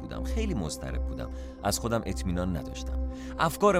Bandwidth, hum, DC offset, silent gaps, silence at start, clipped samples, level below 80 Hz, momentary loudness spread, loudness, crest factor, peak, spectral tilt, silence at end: 16.5 kHz; none; under 0.1%; none; 0 s; under 0.1%; -36 dBFS; 7 LU; -32 LUFS; 20 dB; -10 dBFS; -5 dB/octave; 0 s